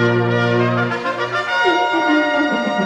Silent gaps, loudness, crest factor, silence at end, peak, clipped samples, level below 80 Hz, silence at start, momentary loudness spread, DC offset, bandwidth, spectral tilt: none; -17 LUFS; 12 dB; 0 s; -4 dBFS; under 0.1%; -58 dBFS; 0 s; 5 LU; under 0.1%; 9 kHz; -6 dB/octave